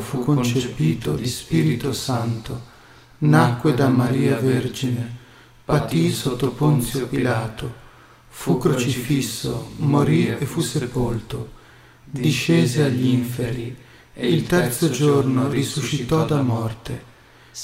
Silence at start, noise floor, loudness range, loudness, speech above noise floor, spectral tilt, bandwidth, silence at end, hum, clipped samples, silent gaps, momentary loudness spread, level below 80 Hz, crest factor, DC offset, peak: 0 s; -48 dBFS; 3 LU; -21 LUFS; 28 dB; -6 dB/octave; 16 kHz; 0 s; none; under 0.1%; none; 15 LU; -44 dBFS; 20 dB; under 0.1%; -2 dBFS